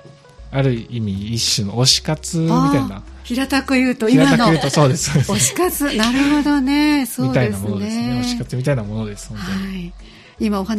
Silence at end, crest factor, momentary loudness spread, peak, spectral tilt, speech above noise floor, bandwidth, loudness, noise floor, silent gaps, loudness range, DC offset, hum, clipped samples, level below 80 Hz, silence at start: 0 s; 18 dB; 12 LU; 0 dBFS; -4.5 dB/octave; 23 dB; 15.5 kHz; -17 LUFS; -40 dBFS; none; 6 LU; under 0.1%; none; under 0.1%; -38 dBFS; 0.05 s